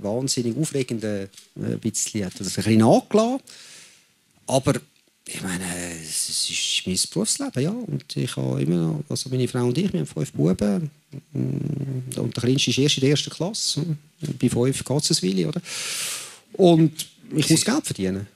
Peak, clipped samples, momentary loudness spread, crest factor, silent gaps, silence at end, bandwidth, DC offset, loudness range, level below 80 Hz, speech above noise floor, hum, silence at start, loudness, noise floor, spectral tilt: -2 dBFS; under 0.1%; 13 LU; 20 dB; none; 0.1 s; 15.5 kHz; under 0.1%; 3 LU; -56 dBFS; 37 dB; none; 0 s; -23 LUFS; -60 dBFS; -4.5 dB/octave